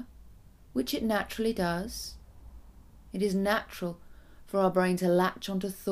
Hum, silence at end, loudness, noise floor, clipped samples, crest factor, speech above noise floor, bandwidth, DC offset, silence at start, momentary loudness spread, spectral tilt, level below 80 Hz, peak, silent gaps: none; 0 s; -30 LUFS; -53 dBFS; under 0.1%; 18 dB; 24 dB; 15.5 kHz; under 0.1%; 0 s; 13 LU; -5.5 dB/octave; -52 dBFS; -12 dBFS; none